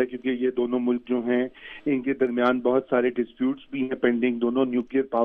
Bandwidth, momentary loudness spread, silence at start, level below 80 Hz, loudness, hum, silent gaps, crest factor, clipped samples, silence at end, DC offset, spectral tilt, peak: 4.3 kHz; 5 LU; 0 s; -62 dBFS; -25 LUFS; none; none; 16 dB; under 0.1%; 0 s; under 0.1%; -8.5 dB/octave; -8 dBFS